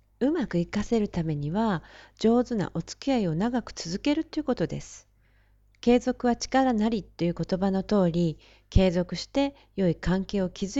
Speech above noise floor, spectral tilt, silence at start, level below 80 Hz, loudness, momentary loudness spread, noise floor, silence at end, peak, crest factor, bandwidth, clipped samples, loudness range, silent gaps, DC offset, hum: 36 dB; -6.5 dB/octave; 0.2 s; -40 dBFS; -27 LUFS; 7 LU; -62 dBFS; 0 s; -6 dBFS; 20 dB; 8 kHz; under 0.1%; 3 LU; none; under 0.1%; none